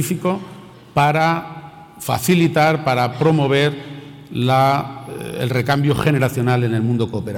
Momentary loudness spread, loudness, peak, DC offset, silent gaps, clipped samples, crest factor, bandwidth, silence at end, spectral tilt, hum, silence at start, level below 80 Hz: 15 LU; -18 LUFS; -6 dBFS; under 0.1%; none; under 0.1%; 12 dB; 18 kHz; 0 s; -6 dB/octave; none; 0 s; -50 dBFS